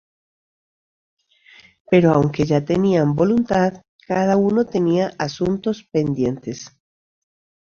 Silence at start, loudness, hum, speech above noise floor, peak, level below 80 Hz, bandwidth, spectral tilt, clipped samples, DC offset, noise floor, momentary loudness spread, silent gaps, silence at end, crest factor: 1.9 s; -19 LUFS; none; 32 dB; -2 dBFS; -52 dBFS; 7.2 kHz; -7.5 dB/octave; under 0.1%; under 0.1%; -50 dBFS; 7 LU; 3.89-3.99 s; 1.05 s; 18 dB